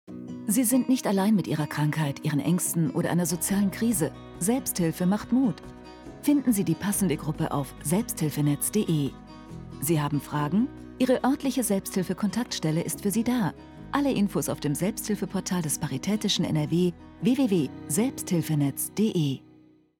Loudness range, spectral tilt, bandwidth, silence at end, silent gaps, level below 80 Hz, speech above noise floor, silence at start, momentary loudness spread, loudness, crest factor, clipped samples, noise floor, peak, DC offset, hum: 2 LU; -5 dB/octave; 19 kHz; 0.6 s; none; -54 dBFS; 31 dB; 0.1 s; 7 LU; -26 LUFS; 18 dB; under 0.1%; -57 dBFS; -8 dBFS; under 0.1%; none